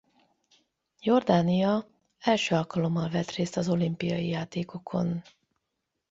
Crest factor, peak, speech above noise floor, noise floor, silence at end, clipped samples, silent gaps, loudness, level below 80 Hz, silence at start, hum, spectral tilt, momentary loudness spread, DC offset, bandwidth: 20 dB; -8 dBFS; 56 dB; -82 dBFS; 0.9 s; under 0.1%; none; -28 LUFS; -64 dBFS; 1.05 s; none; -6.5 dB/octave; 9 LU; under 0.1%; 7.8 kHz